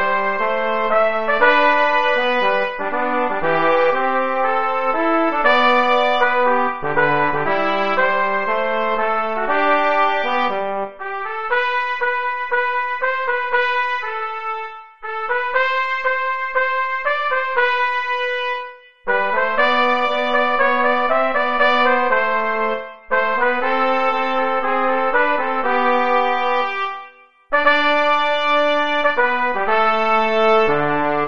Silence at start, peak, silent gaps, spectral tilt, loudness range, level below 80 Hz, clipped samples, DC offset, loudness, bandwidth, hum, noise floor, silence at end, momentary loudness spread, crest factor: 0 s; 0 dBFS; none; -5 dB/octave; 4 LU; -54 dBFS; under 0.1%; 3%; -18 LUFS; 7 kHz; none; -43 dBFS; 0 s; 7 LU; 18 dB